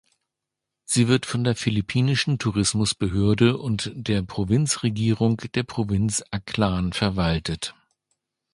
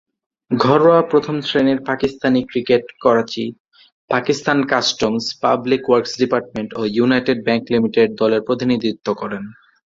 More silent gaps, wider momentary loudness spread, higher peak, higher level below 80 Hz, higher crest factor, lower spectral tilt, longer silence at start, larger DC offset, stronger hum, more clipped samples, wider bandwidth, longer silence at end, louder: second, none vs 3.60-3.65 s, 3.92-4.08 s; about the same, 7 LU vs 9 LU; about the same, -4 dBFS vs -2 dBFS; first, -42 dBFS vs -54 dBFS; about the same, 18 dB vs 16 dB; about the same, -5 dB/octave vs -5.5 dB/octave; first, 0.9 s vs 0.5 s; neither; neither; neither; first, 11.5 kHz vs 7.8 kHz; first, 0.8 s vs 0.4 s; second, -23 LUFS vs -17 LUFS